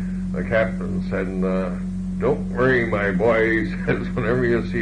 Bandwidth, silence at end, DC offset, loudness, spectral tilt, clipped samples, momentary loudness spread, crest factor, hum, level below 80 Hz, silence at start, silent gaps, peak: 9.6 kHz; 0 s; under 0.1%; -22 LUFS; -8 dB/octave; under 0.1%; 8 LU; 14 dB; none; -36 dBFS; 0 s; none; -8 dBFS